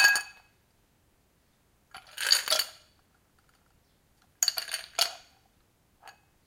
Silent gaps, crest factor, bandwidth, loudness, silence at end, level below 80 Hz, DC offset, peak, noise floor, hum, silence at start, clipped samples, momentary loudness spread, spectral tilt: none; 28 dB; 17 kHz; -27 LUFS; 0.35 s; -72 dBFS; under 0.1%; -6 dBFS; -68 dBFS; none; 0 s; under 0.1%; 25 LU; 3 dB/octave